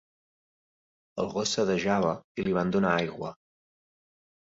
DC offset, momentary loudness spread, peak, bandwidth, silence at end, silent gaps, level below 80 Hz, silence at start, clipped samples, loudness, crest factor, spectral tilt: under 0.1%; 12 LU; -10 dBFS; 8 kHz; 1.25 s; 2.24-2.35 s; -60 dBFS; 1.15 s; under 0.1%; -28 LUFS; 20 dB; -5 dB/octave